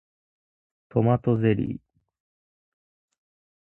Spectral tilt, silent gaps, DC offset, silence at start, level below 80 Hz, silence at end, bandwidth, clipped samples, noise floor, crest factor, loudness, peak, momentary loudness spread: -11.5 dB/octave; none; under 0.1%; 0.95 s; -56 dBFS; 1.9 s; 3.3 kHz; under 0.1%; under -90 dBFS; 22 dB; -24 LUFS; -8 dBFS; 10 LU